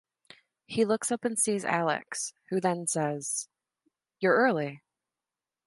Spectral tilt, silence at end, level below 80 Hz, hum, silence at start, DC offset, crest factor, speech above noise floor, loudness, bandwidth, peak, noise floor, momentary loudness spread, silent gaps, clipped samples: -4 dB/octave; 0.9 s; -78 dBFS; none; 0.7 s; under 0.1%; 20 dB; over 62 dB; -29 LUFS; 12 kHz; -12 dBFS; under -90 dBFS; 11 LU; none; under 0.1%